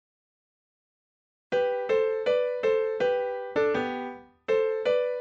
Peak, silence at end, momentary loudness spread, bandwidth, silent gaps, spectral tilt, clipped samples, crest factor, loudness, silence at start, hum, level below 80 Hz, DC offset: -14 dBFS; 0 s; 6 LU; 7.2 kHz; none; -5 dB/octave; under 0.1%; 14 dB; -27 LUFS; 1.5 s; none; -70 dBFS; under 0.1%